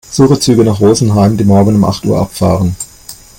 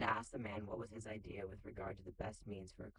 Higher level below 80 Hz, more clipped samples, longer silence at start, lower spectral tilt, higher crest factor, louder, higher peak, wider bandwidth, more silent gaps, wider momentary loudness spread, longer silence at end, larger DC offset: first, -36 dBFS vs -62 dBFS; neither; about the same, 0.1 s vs 0 s; about the same, -6.5 dB/octave vs -5.5 dB/octave; second, 10 dB vs 20 dB; first, -10 LUFS vs -48 LUFS; first, 0 dBFS vs -26 dBFS; first, 17 kHz vs 11 kHz; neither; about the same, 6 LU vs 8 LU; first, 0.25 s vs 0.05 s; neither